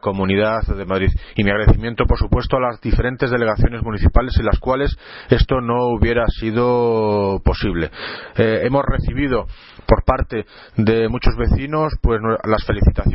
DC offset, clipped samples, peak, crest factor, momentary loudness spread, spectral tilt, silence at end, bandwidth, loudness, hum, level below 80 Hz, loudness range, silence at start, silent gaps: under 0.1%; under 0.1%; 0 dBFS; 16 dB; 6 LU; -11.5 dB/octave; 0 s; 5.8 kHz; -18 LUFS; none; -22 dBFS; 1 LU; 0 s; none